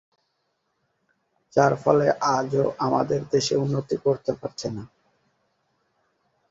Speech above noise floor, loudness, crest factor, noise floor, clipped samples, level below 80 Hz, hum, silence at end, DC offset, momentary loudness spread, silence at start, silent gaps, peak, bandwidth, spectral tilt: 51 dB; -23 LUFS; 22 dB; -74 dBFS; under 0.1%; -60 dBFS; none; 1.65 s; under 0.1%; 11 LU; 1.55 s; none; -4 dBFS; 8 kHz; -5.5 dB/octave